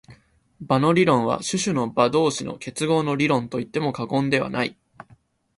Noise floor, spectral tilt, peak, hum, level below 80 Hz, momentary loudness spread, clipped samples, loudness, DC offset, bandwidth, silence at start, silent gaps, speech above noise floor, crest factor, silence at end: -57 dBFS; -5 dB/octave; -4 dBFS; none; -58 dBFS; 9 LU; under 0.1%; -22 LUFS; under 0.1%; 11.5 kHz; 0.1 s; none; 35 dB; 20 dB; 0.85 s